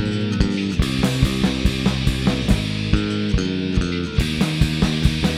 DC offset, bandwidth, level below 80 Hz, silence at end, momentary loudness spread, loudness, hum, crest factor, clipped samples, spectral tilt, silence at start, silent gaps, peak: under 0.1%; 15.5 kHz; -26 dBFS; 0 s; 3 LU; -20 LUFS; none; 18 dB; under 0.1%; -6 dB/octave; 0 s; none; -2 dBFS